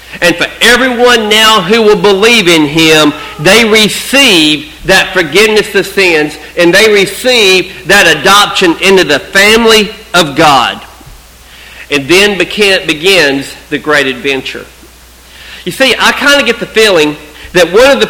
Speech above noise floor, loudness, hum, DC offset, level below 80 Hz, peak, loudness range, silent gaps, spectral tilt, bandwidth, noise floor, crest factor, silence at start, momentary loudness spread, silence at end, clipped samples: 28 dB; -6 LUFS; none; under 0.1%; -36 dBFS; 0 dBFS; 5 LU; none; -3 dB/octave; over 20 kHz; -35 dBFS; 8 dB; 0.05 s; 9 LU; 0 s; 3%